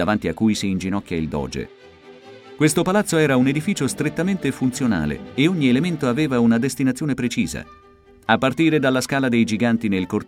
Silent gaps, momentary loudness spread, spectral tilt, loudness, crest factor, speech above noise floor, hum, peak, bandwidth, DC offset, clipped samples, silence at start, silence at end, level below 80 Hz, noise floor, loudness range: none; 8 LU; -5.5 dB/octave; -20 LUFS; 18 dB; 30 dB; none; -2 dBFS; 17.5 kHz; under 0.1%; under 0.1%; 0 s; 0 s; -46 dBFS; -49 dBFS; 2 LU